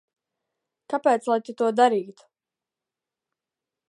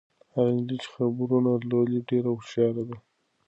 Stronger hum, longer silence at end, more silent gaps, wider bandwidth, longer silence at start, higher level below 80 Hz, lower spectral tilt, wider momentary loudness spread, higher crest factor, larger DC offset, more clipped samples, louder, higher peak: neither; first, 1.8 s vs 0.5 s; neither; first, 11.5 kHz vs 8.2 kHz; first, 0.9 s vs 0.35 s; second, -84 dBFS vs -70 dBFS; second, -4.5 dB/octave vs -8.5 dB/octave; about the same, 10 LU vs 10 LU; first, 22 dB vs 16 dB; neither; neither; first, -23 LUFS vs -26 LUFS; first, -4 dBFS vs -12 dBFS